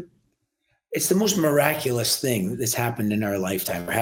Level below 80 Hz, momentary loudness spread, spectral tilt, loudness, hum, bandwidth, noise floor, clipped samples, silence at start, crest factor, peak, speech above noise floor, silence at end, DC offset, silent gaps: -60 dBFS; 6 LU; -4 dB/octave; -23 LUFS; none; 17 kHz; -73 dBFS; under 0.1%; 0 s; 22 dB; -2 dBFS; 50 dB; 0 s; under 0.1%; none